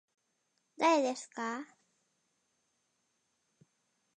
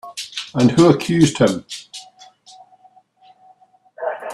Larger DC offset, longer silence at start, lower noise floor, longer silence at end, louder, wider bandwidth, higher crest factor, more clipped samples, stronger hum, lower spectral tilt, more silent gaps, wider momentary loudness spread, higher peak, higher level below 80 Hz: neither; first, 0.8 s vs 0.05 s; first, -80 dBFS vs -53 dBFS; first, 2.55 s vs 0 s; second, -32 LUFS vs -17 LUFS; second, 10 kHz vs 13 kHz; about the same, 22 dB vs 20 dB; neither; neither; second, -2.5 dB/octave vs -6 dB/octave; neither; second, 15 LU vs 19 LU; second, -18 dBFS vs 0 dBFS; second, under -90 dBFS vs -54 dBFS